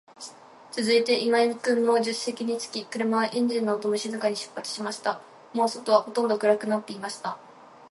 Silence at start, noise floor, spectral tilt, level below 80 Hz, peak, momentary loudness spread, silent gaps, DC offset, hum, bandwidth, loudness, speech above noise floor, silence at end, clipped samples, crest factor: 0.2 s; -46 dBFS; -3.5 dB/octave; -80 dBFS; -6 dBFS; 12 LU; none; under 0.1%; none; 11.5 kHz; -26 LUFS; 21 dB; 0.05 s; under 0.1%; 22 dB